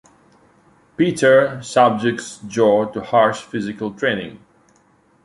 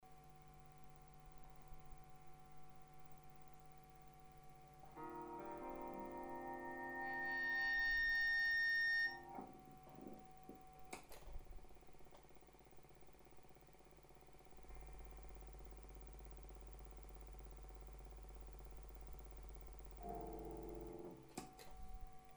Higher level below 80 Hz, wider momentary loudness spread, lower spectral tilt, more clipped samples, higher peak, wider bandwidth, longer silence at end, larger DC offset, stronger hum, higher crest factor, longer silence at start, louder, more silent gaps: about the same, -58 dBFS vs -60 dBFS; second, 13 LU vs 27 LU; about the same, -5 dB/octave vs -4 dB/octave; neither; first, -2 dBFS vs -32 dBFS; second, 11.5 kHz vs over 20 kHz; first, 0.9 s vs 0 s; neither; second, none vs 50 Hz at -65 dBFS; about the same, 18 dB vs 16 dB; first, 1 s vs 0 s; first, -18 LUFS vs -43 LUFS; neither